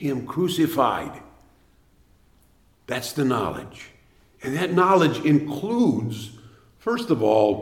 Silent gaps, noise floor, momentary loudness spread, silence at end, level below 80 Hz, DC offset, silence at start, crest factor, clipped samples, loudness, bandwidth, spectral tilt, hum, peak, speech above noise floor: none; -59 dBFS; 18 LU; 0 s; -58 dBFS; under 0.1%; 0 s; 18 dB; under 0.1%; -22 LUFS; 17 kHz; -6 dB/octave; none; -6 dBFS; 37 dB